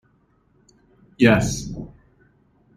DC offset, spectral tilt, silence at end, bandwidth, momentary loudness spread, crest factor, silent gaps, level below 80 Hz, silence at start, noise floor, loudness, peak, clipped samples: under 0.1%; -5.5 dB/octave; 0.9 s; 14.5 kHz; 21 LU; 22 dB; none; -44 dBFS; 1.2 s; -61 dBFS; -19 LUFS; -2 dBFS; under 0.1%